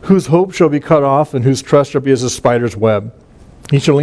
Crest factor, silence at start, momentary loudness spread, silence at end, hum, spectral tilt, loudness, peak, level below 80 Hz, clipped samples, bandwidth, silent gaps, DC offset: 12 dB; 0 s; 4 LU; 0 s; none; -6.5 dB/octave; -13 LUFS; 0 dBFS; -44 dBFS; under 0.1%; 11 kHz; none; under 0.1%